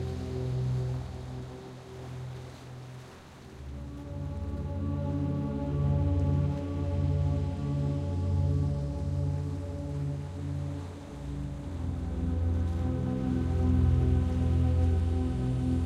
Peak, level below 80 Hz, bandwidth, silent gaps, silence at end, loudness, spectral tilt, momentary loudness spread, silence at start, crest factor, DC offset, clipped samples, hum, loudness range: -16 dBFS; -38 dBFS; 8.8 kHz; none; 0 s; -31 LUFS; -9 dB/octave; 16 LU; 0 s; 14 dB; under 0.1%; under 0.1%; none; 11 LU